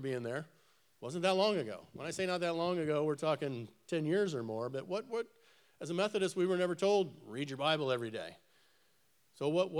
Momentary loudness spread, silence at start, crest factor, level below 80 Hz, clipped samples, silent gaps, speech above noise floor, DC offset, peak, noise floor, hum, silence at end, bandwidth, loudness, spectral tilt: 13 LU; 0 s; 20 dB; -84 dBFS; under 0.1%; none; 39 dB; under 0.1%; -16 dBFS; -74 dBFS; none; 0 s; 13.5 kHz; -35 LUFS; -5.5 dB/octave